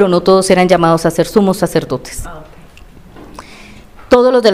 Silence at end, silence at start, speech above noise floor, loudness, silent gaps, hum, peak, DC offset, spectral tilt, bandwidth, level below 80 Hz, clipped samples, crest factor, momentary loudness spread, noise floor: 0 s; 0 s; 27 dB; -11 LUFS; none; none; 0 dBFS; 0.5%; -5.5 dB/octave; 16 kHz; -36 dBFS; 0.3%; 12 dB; 19 LU; -38 dBFS